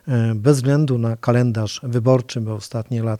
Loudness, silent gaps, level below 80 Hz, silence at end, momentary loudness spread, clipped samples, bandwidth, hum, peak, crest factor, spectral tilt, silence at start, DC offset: -19 LUFS; none; -58 dBFS; 0 s; 9 LU; under 0.1%; 12.5 kHz; none; -2 dBFS; 16 dB; -7 dB/octave; 0.05 s; under 0.1%